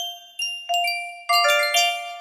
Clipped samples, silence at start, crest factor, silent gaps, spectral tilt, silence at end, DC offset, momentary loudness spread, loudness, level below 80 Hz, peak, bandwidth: under 0.1%; 0 s; 16 dB; none; 4 dB/octave; 0 s; under 0.1%; 11 LU; -21 LUFS; -78 dBFS; -6 dBFS; 16 kHz